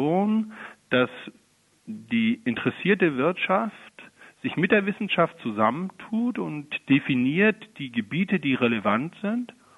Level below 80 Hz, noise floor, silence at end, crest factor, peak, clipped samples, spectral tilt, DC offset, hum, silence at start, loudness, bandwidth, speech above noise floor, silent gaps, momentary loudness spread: -68 dBFS; -60 dBFS; 0.25 s; 20 dB; -4 dBFS; under 0.1%; -7.5 dB/octave; under 0.1%; none; 0 s; -25 LUFS; 11 kHz; 35 dB; none; 12 LU